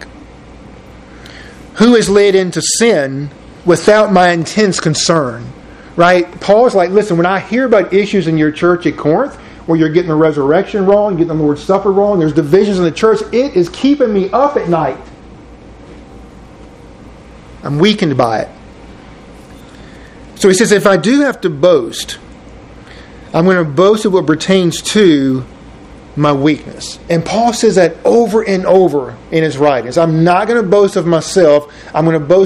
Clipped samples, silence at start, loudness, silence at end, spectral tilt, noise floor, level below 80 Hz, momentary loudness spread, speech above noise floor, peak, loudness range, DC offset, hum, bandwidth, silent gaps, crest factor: 0.2%; 0 s; -11 LUFS; 0 s; -5.5 dB/octave; -35 dBFS; -42 dBFS; 11 LU; 24 dB; 0 dBFS; 7 LU; under 0.1%; none; 14.5 kHz; none; 12 dB